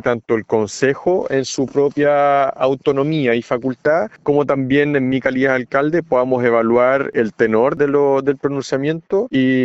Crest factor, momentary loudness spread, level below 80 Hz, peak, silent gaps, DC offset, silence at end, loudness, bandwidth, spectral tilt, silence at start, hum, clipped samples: 14 dB; 5 LU; -54 dBFS; -2 dBFS; none; under 0.1%; 0 s; -17 LUFS; 8.2 kHz; -6 dB/octave; 0.05 s; none; under 0.1%